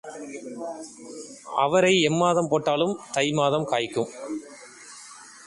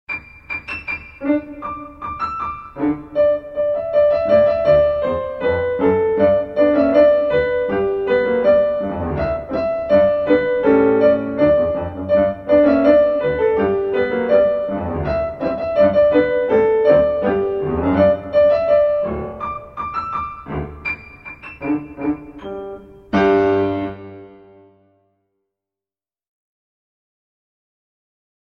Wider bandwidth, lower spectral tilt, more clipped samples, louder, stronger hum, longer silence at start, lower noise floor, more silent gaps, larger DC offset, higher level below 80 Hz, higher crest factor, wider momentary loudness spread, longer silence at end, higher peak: first, 11.5 kHz vs 5.8 kHz; second, -4.5 dB/octave vs -9 dB/octave; neither; second, -23 LUFS vs -17 LUFS; neither; about the same, 0.05 s vs 0.1 s; second, -45 dBFS vs under -90 dBFS; neither; neither; second, -64 dBFS vs -42 dBFS; about the same, 18 dB vs 16 dB; first, 22 LU vs 14 LU; second, 0 s vs 4.3 s; second, -8 dBFS vs 0 dBFS